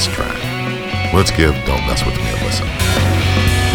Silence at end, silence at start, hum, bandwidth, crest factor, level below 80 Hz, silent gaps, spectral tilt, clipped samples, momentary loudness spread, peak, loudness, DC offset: 0 s; 0 s; none; 19.5 kHz; 16 dB; -24 dBFS; none; -4.5 dB/octave; under 0.1%; 6 LU; 0 dBFS; -16 LUFS; under 0.1%